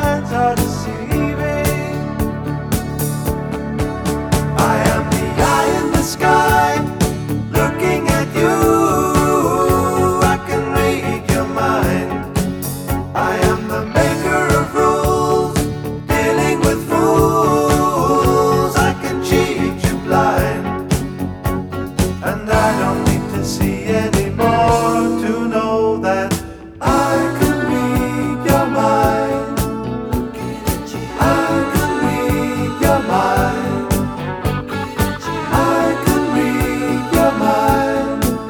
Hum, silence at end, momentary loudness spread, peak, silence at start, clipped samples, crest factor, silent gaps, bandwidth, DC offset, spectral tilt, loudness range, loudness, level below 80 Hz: none; 0 s; 8 LU; 0 dBFS; 0 s; under 0.1%; 16 dB; none; over 20 kHz; under 0.1%; -5.5 dB/octave; 4 LU; -16 LUFS; -30 dBFS